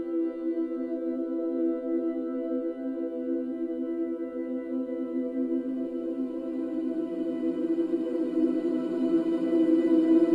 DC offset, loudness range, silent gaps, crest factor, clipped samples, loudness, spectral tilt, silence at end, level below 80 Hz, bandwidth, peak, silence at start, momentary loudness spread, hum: under 0.1%; 5 LU; none; 16 dB; under 0.1%; -29 LUFS; -8 dB/octave; 0 s; -70 dBFS; 4.6 kHz; -12 dBFS; 0 s; 9 LU; none